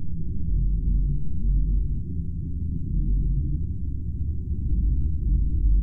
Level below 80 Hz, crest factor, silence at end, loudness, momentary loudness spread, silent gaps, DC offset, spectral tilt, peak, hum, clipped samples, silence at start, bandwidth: -24 dBFS; 12 dB; 0 s; -28 LUFS; 6 LU; none; under 0.1%; -14 dB/octave; -12 dBFS; none; under 0.1%; 0 s; 0.4 kHz